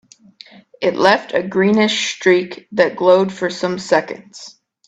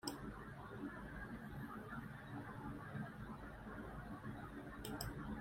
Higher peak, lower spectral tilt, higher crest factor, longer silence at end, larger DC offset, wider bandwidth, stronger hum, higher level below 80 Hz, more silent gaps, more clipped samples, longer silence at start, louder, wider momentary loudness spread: first, 0 dBFS vs -26 dBFS; about the same, -4.5 dB/octave vs -5.5 dB/octave; second, 18 dB vs 24 dB; first, 0.35 s vs 0 s; neither; second, 8.4 kHz vs 16 kHz; neither; about the same, -60 dBFS vs -60 dBFS; neither; neither; first, 0.8 s vs 0.05 s; first, -16 LUFS vs -51 LUFS; first, 12 LU vs 5 LU